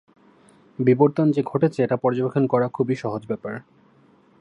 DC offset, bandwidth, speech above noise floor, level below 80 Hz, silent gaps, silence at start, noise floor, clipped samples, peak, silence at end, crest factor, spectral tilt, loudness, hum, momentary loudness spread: under 0.1%; 10 kHz; 35 dB; -68 dBFS; none; 0.8 s; -56 dBFS; under 0.1%; -2 dBFS; 0.8 s; 20 dB; -9 dB/octave; -22 LUFS; none; 12 LU